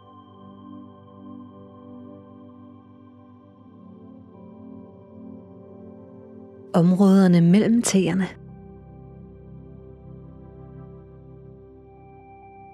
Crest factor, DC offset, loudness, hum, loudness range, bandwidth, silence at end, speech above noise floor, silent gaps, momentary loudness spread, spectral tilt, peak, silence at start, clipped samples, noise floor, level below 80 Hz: 20 dB; under 0.1%; -18 LUFS; none; 25 LU; 13 kHz; 1.9 s; 32 dB; none; 29 LU; -6.5 dB/octave; -6 dBFS; 0.75 s; under 0.1%; -49 dBFS; -56 dBFS